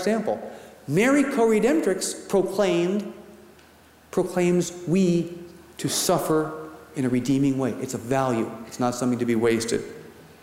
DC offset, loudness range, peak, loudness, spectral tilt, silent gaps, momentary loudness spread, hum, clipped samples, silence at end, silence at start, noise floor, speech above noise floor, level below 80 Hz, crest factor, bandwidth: under 0.1%; 2 LU; -8 dBFS; -24 LUFS; -5 dB/octave; none; 15 LU; none; under 0.1%; 0.2 s; 0 s; -53 dBFS; 30 dB; -58 dBFS; 16 dB; 16 kHz